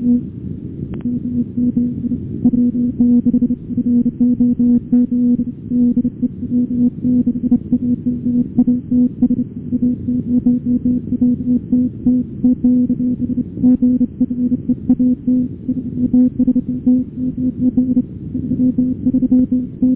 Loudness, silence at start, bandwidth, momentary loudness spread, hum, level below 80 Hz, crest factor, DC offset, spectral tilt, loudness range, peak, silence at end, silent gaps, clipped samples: -16 LUFS; 0 s; 1 kHz; 7 LU; none; -38 dBFS; 12 dB; under 0.1%; -14.5 dB/octave; 2 LU; -4 dBFS; 0 s; none; under 0.1%